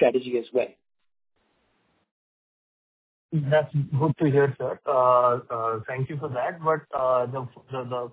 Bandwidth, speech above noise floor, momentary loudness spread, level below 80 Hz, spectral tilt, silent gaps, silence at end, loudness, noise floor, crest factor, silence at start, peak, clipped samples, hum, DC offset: 4 kHz; 45 dB; 11 LU; -66 dBFS; -11 dB/octave; 2.11-3.29 s; 0 s; -25 LUFS; -70 dBFS; 18 dB; 0 s; -8 dBFS; under 0.1%; none; under 0.1%